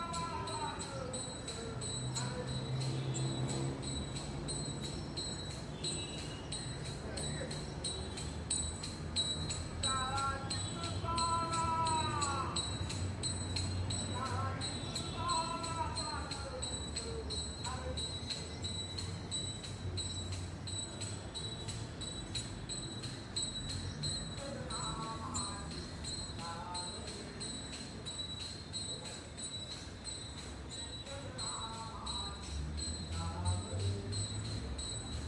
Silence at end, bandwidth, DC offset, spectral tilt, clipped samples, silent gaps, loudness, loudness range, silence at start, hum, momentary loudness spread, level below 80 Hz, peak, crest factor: 0 s; 11.5 kHz; under 0.1%; -3.5 dB/octave; under 0.1%; none; -39 LUFS; 6 LU; 0 s; none; 8 LU; -52 dBFS; -22 dBFS; 18 dB